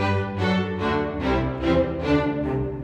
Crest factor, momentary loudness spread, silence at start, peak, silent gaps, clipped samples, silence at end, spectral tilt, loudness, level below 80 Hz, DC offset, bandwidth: 16 dB; 3 LU; 0 s; -8 dBFS; none; under 0.1%; 0 s; -7.5 dB/octave; -24 LUFS; -38 dBFS; under 0.1%; 8.8 kHz